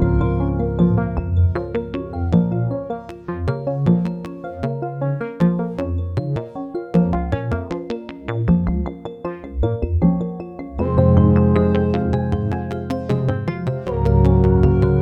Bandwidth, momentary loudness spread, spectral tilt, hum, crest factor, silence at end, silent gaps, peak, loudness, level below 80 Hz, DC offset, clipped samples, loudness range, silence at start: 5.6 kHz; 14 LU; -10.5 dB/octave; none; 18 dB; 0 s; none; 0 dBFS; -20 LUFS; -28 dBFS; under 0.1%; under 0.1%; 4 LU; 0 s